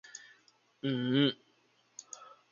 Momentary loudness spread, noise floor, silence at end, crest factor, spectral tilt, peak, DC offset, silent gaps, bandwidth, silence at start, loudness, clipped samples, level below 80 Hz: 22 LU; -70 dBFS; 0.25 s; 22 dB; -5 dB/octave; -14 dBFS; under 0.1%; none; 7.4 kHz; 0.15 s; -32 LUFS; under 0.1%; -80 dBFS